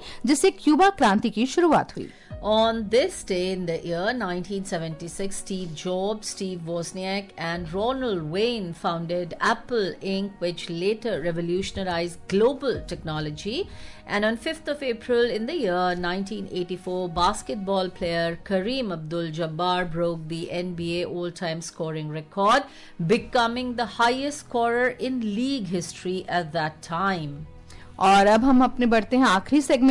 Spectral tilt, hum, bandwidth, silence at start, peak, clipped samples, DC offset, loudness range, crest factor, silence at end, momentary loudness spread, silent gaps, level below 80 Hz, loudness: -5 dB/octave; none; 11.5 kHz; 0 s; -10 dBFS; under 0.1%; under 0.1%; 6 LU; 16 dB; 0 s; 11 LU; none; -48 dBFS; -25 LUFS